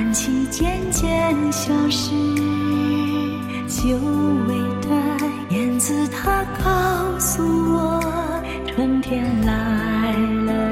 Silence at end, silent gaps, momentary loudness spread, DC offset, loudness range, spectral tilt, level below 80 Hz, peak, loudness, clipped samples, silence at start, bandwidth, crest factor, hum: 0 s; none; 4 LU; under 0.1%; 1 LU; -4.5 dB/octave; -34 dBFS; -6 dBFS; -20 LUFS; under 0.1%; 0 s; 16.5 kHz; 14 dB; none